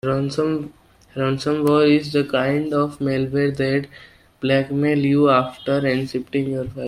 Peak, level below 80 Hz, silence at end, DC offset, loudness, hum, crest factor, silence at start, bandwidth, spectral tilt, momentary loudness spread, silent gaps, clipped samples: -4 dBFS; -52 dBFS; 0 s; under 0.1%; -20 LUFS; none; 16 dB; 0.05 s; 13 kHz; -7 dB/octave; 9 LU; none; under 0.1%